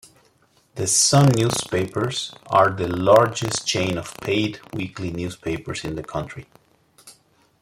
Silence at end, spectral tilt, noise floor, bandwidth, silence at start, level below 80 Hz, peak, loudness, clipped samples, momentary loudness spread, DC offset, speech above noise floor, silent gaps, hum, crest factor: 0.5 s; -4 dB/octave; -60 dBFS; 16 kHz; 0.75 s; -52 dBFS; -2 dBFS; -21 LUFS; under 0.1%; 15 LU; under 0.1%; 39 dB; none; none; 22 dB